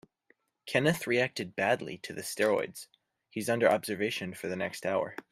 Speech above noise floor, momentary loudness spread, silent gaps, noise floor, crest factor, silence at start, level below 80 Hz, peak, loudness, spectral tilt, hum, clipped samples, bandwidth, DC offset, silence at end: 40 dB; 12 LU; none; -70 dBFS; 22 dB; 0.65 s; -72 dBFS; -10 dBFS; -31 LUFS; -4.5 dB/octave; none; under 0.1%; 16 kHz; under 0.1%; 0.1 s